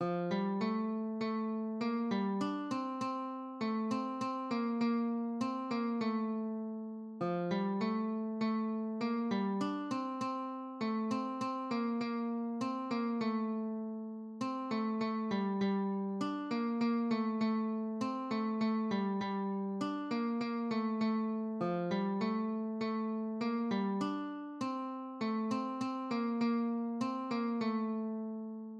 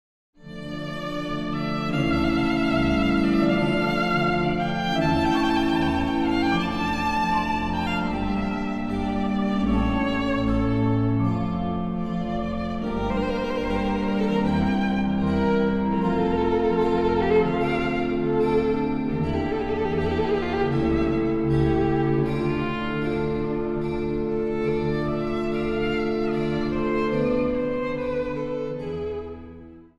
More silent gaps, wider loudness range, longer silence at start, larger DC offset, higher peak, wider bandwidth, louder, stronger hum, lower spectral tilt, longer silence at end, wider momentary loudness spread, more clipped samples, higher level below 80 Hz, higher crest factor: neither; about the same, 2 LU vs 3 LU; second, 0 s vs 0.4 s; neither; second, -24 dBFS vs -8 dBFS; second, 8.2 kHz vs 12 kHz; second, -36 LUFS vs -24 LUFS; neither; about the same, -7 dB/octave vs -7.5 dB/octave; second, 0 s vs 0.15 s; about the same, 6 LU vs 6 LU; neither; second, -86 dBFS vs -38 dBFS; about the same, 12 dB vs 14 dB